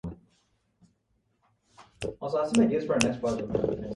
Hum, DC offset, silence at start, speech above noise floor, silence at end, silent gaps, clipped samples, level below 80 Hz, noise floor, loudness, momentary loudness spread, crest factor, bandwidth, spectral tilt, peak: none; under 0.1%; 0.05 s; 46 dB; 0 s; none; under 0.1%; -54 dBFS; -73 dBFS; -28 LUFS; 14 LU; 28 dB; 11.5 kHz; -5 dB/octave; -2 dBFS